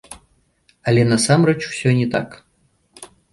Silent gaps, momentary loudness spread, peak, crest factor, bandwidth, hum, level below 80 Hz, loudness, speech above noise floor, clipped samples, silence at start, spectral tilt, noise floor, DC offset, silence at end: none; 11 LU; -2 dBFS; 18 dB; 11.5 kHz; none; -54 dBFS; -17 LUFS; 46 dB; under 0.1%; 0.1 s; -5.5 dB/octave; -62 dBFS; under 0.1%; 0.25 s